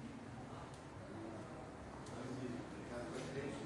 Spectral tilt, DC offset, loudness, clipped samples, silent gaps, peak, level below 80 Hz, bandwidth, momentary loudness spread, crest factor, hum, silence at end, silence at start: -6 dB/octave; under 0.1%; -49 LUFS; under 0.1%; none; -32 dBFS; -66 dBFS; 11.5 kHz; 6 LU; 16 dB; none; 0 s; 0 s